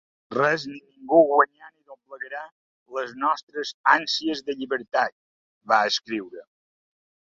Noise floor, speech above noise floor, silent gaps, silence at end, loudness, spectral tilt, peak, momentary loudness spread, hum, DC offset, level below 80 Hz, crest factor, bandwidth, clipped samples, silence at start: -48 dBFS; 25 dB; 2.52-2.86 s, 3.43-3.47 s, 3.74-3.84 s, 5.12-5.61 s; 0.9 s; -23 LUFS; -3.5 dB/octave; -2 dBFS; 17 LU; none; under 0.1%; -72 dBFS; 22 dB; 7.6 kHz; under 0.1%; 0.3 s